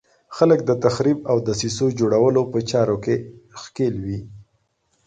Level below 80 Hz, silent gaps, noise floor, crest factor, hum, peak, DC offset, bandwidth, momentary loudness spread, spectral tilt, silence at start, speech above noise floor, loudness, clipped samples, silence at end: -52 dBFS; none; -67 dBFS; 18 dB; none; -4 dBFS; under 0.1%; 9.4 kHz; 15 LU; -6 dB/octave; 0.3 s; 48 dB; -20 LUFS; under 0.1%; 0.65 s